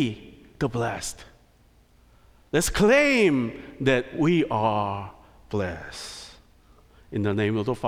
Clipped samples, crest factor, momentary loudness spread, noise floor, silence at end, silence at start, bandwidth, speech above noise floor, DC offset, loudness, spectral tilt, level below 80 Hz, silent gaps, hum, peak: under 0.1%; 18 dB; 18 LU; -58 dBFS; 0 s; 0 s; 16.5 kHz; 34 dB; under 0.1%; -24 LUFS; -5 dB/octave; -46 dBFS; none; none; -8 dBFS